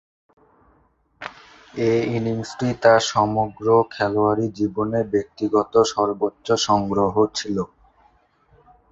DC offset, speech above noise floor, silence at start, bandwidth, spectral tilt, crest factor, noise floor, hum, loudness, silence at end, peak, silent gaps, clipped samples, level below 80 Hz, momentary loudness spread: under 0.1%; 41 dB; 1.2 s; 8 kHz; -5 dB/octave; 20 dB; -61 dBFS; none; -21 LUFS; 1.25 s; -2 dBFS; none; under 0.1%; -52 dBFS; 10 LU